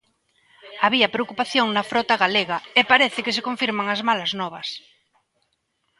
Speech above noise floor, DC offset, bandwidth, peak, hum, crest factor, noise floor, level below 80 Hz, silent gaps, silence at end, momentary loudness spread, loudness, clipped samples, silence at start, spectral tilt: 50 dB; under 0.1%; 11.5 kHz; 0 dBFS; none; 22 dB; -72 dBFS; -68 dBFS; none; 1.2 s; 12 LU; -20 LUFS; under 0.1%; 0.65 s; -3.5 dB/octave